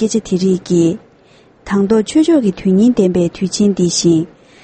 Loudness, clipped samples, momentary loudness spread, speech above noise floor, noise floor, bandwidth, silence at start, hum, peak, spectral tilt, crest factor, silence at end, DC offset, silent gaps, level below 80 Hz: -14 LUFS; under 0.1%; 6 LU; 34 dB; -47 dBFS; 8.8 kHz; 0 s; none; 0 dBFS; -6 dB/octave; 12 dB; 0.35 s; under 0.1%; none; -46 dBFS